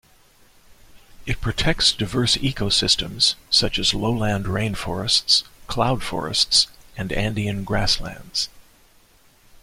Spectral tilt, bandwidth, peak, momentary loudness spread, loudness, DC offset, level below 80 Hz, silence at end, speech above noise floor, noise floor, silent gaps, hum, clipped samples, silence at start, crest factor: -3 dB/octave; 16.5 kHz; -4 dBFS; 10 LU; -20 LUFS; under 0.1%; -38 dBFS; 1 s; 33 dB; -54 dBFS; none; none; under 0.1%; 0.7 s; 20 dB